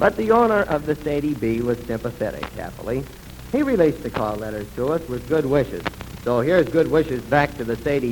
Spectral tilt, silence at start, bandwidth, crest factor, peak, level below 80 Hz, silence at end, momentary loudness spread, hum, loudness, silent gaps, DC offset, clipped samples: -7 dB/octave; 0 s; 19 kHz; 20 dB; -2 dBFS; -42 dBFS; 0 s; 12 LU; none; -22 LUFS; none; under 0.1%; under 0.1%